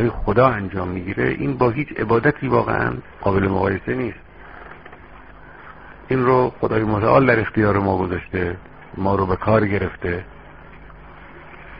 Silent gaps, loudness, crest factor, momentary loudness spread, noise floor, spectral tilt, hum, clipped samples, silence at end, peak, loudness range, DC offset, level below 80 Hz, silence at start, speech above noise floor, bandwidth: none; -20 LUFS; 20 dB; 23 LU; -42 dBFS; -6.5 dB/octave; none; under 0.1%; 0 s; 0 dBFS; 5 LU; 0.3%; -40 dBFS; 0 s; 23 dB; 5.2 kHz